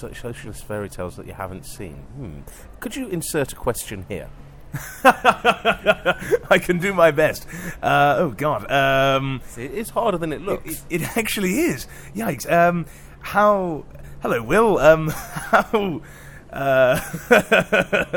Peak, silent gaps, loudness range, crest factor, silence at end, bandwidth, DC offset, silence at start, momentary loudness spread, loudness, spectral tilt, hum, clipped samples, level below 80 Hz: 0 dBFS; none; 11 LU; 20 dB; 0 s; 17.5 kHz; under 0.1%; 0 s; 17 LU; -20 LUFS; -5 dB/octave; none; under 0.1%; -42 dBFS